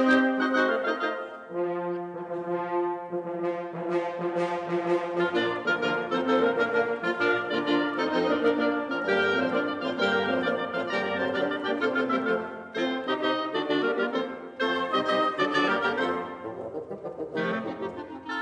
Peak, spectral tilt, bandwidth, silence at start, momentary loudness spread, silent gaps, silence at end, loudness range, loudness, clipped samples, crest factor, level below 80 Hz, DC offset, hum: -10 dBFS; -5.5 dB/octave; 9.8 kHz; 0 s; 10 LU; none; 0 s; 4 LU; -27 LUFS; under 0.1%; 18 dB; -70 dBFS; under 0.1%; none